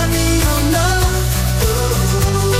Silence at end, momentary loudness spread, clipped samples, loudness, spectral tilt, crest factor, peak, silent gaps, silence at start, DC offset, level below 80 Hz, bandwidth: 0 s; 2 LU; under 0.1%; -15 LUFS; -4.5 dB/octave; 12 dB; -2 dBFS; none; 0 s; 1%; -20 dBFS; 16.5 kHz